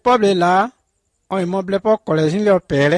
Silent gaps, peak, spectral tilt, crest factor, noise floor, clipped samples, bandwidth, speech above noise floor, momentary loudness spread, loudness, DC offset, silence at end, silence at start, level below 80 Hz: none; -4 dBFS; -6.5 dB/octave; 12 dB; -68 dBFS; under 0.1%; 10.5 kHz; 52 dB; 8 LU; -17 LUFS; under 0.1%; 0 s; 0.05 s; -52 dBFS